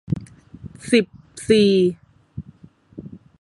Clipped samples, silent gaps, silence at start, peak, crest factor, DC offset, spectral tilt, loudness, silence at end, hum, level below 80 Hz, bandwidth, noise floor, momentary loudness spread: under 0.1%; none; 0.1 s; -2 dBFS; 20 dB; under 0.1%; -6 dB/octave; -19 LUFS; 0.25 s; none; -50 dBFS; 11.5 kHz; -48 dBFS; 25 LU